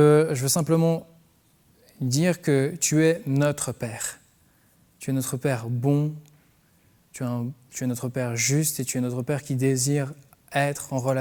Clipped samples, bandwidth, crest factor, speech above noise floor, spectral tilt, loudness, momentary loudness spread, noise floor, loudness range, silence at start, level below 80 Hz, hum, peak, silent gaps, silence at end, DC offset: under 0.1%; over 20 kHz; 18 dB; 37 dB; -5 dB/octave; -25 LUFS; 11 LU; -61 dBFS; 5 LU; 0 s; -64 dBFS; none; -6 dBFS; none; 0 s; under 0.1%